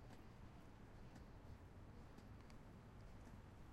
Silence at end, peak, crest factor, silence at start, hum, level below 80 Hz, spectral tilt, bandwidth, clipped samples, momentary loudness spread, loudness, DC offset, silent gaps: 0 s; -46 dBFS; 14 dB; 0 s; none; -66 dBFS; -6.5 dB/octave; 16 kHz; under 0.1%; 1 LU; -62 LUFS; under 0.1%; none